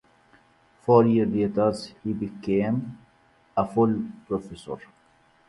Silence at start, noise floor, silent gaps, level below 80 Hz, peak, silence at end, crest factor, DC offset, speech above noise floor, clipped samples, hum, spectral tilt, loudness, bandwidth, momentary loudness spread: 0.85 s; -61 dBFS; none; -58 dBFS; -4 dBFS; 0.7 s; 22 dB; under 0.1%; 37 dB; under 0.1%; none; -8.5 dB/octave; -25 LUFS; 11.5 kHz; 18 LU